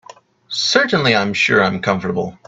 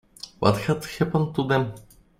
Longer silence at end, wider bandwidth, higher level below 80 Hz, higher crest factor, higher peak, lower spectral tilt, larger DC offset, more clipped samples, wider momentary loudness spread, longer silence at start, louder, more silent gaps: second, 0.15 s vs 0.4 s; second, 8 kHz vs 16 kHz; about the same, -56 dBFS vs -52 dBFS; about the same, 18 dB vs 22 dB; first, 0 dBFS vs -4 dBFS; second, -4 dB/octave vs -6.5 dB/octave; neither; neither; about the same, 7 LU vs 7 LU; first, 0.5 s vs 0.25 s; first, -16 LUFS vs -24 LUFS; neither